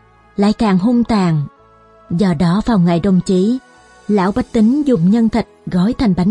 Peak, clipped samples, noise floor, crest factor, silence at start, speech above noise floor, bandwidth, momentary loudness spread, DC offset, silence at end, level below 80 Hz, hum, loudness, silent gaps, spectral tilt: -2 dBFS; under 0.1%; -46 dBFS; 12 dB; 0.4 s; 33 dB; 10.5 kHz; 8 LU; under 0.1%; 0 s; -38 dBFS; none; -15 LUFS; none; -8 dB/octave